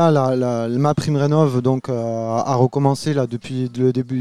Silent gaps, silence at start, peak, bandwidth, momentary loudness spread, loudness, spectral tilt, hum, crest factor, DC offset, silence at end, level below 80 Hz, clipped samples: none; 0 s; -2 dBFS; 12.5 kHz; 6 LU; -19 LUFS; -7.5 dB/octave; none; 16 dB; 0.4%; 0 s; -56 dBFS; under 0.1%